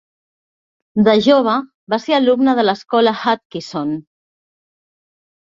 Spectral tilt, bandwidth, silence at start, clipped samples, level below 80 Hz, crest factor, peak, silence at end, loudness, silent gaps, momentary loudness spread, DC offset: -6 dB/octave; 7.6 kHz; 0.95 s; under 0.1%; -62 dBFS; 16 dB; -2 dBFS; 1.4 s; -16 LUFS; 1.74-1.87 s, 3.45-3.50 s; 11 LU; under 0.1%